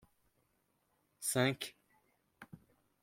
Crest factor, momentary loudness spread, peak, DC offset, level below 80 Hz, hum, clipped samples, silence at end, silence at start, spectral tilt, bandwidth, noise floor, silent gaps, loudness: 24 dB; 24 LU; -18 dBFS; under 0.1%; -80 dBFS; none; under 0.1%; 0.45 s; 1.2 s; -3.5 dB/octave; 16.5 kHz; -79 dBFS; none; -36 LUFS